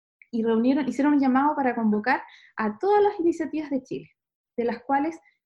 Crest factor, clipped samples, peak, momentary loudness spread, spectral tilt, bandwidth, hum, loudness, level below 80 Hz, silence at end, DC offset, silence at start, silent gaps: 16 dB; under 0.1%; -8 dBFS; 11 LU; -7 dB/octave; 8.4 kHz; none; -24 LUFS; -66 dBFS; 0.3 s; under 0.1%; 0.35 s; 4.35-4.44 s